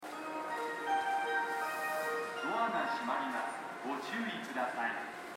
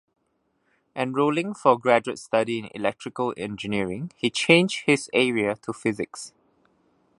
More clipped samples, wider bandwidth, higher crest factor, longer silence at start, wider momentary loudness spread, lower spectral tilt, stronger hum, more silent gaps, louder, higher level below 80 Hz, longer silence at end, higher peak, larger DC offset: neither; first, 16 kHz vs 11.5 kHz; second, 16 dB vs 24 dB; second, 0 s vs 0.95 s; second, 7 LU vs 13 LU; second, -3 dB/octave vs -4.5 dB/octave; neither; neither; second, -36 LUFS vs -24 LUFS; second, -84 dBFS vs -64 dBFS; second, 0 s vs 0.9 s; second, -20 dBFS vs 0 dBFS; neither